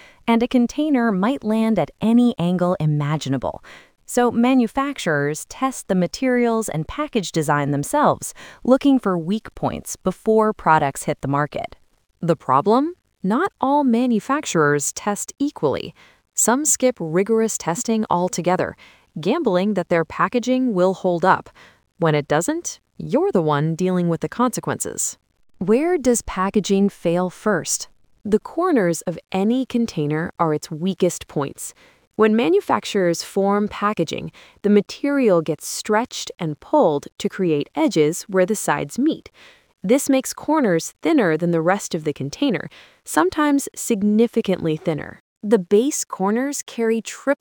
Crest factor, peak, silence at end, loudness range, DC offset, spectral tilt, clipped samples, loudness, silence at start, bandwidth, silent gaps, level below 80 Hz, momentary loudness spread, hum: 18 dB; -2 dBFS; 0.05 s; 2 LU; under 0.1%; -5 dB/octave; under 0.1%; -20 LUFS; 0.25 s; 19.5 kHz; 32.07-32.11 s, 45.20-45.36 s; -52 dBFS; 9 LU; none